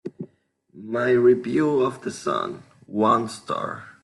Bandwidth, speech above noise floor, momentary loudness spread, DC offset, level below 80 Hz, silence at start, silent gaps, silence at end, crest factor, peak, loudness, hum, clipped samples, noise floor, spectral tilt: 11.5 kHz; 39 dB; 21 LU; under 0.1%; -66 dBFS; 0.05 s; none; 0.1 s; 16 dB; -6 dBFS; -23 LUFS; none; under 0.1%; -61 dBFS; -6 dB/octave